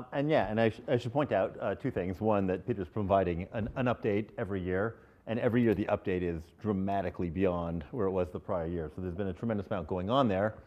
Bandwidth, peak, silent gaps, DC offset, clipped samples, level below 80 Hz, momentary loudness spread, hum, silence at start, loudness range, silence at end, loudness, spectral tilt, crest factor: 9 kHz; -12 dBFS; none; under 0.1%; under 0.1%; -58 dBFS; 8 LU; none; 0 s; 3 LU; 0.05 s; -32 LUFS; -8.5 dB/octave; 20 dB